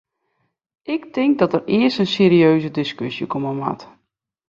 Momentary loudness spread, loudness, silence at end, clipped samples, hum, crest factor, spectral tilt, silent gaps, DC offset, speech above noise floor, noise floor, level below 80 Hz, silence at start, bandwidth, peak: 13 LU; -18 LUFS; 0.65 s; under 0.1%; none; 18 dB; -7.5 dB/octave; none; under 0.1%; 55 dB; -73 dBFS; -60 dBFS; 0.9 s; 7.4 kHz; -2 dBFS